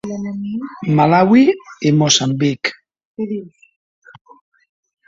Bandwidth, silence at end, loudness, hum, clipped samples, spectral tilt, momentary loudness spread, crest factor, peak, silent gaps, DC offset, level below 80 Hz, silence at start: 7.8 kHz; 1.6 s; -15 LUFS; none; under 0.1%; -5 dB/octave; 14 LU; 16 dB; 0 dBFS; 3.05-3.15 s; under 0.1%; -58 dBFS; 0.05 s